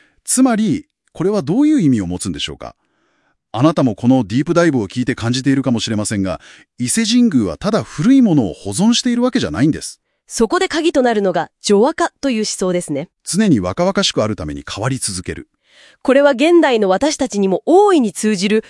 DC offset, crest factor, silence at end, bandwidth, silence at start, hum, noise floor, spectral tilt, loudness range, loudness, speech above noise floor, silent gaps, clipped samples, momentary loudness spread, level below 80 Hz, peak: under 0.1%; 16 dB; 0.1 s; 12 kHz; 0.25 s; none; -62 dBFS; -5 dB/octave; 3 LU; -15 LUFS; 47 dB; none; under 0.1%; 12 LU; -48 dBFS; 0 dBFS